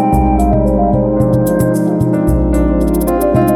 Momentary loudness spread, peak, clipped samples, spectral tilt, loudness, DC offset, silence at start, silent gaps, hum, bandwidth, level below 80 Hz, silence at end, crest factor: 2 LU; 0 dBFS; under 0.1%; -8.5 dB/octave; -13 LUFS; under 0.1%; 0 s; none; none; 17 kHz; -20 dBFS; 0 s; 10 dB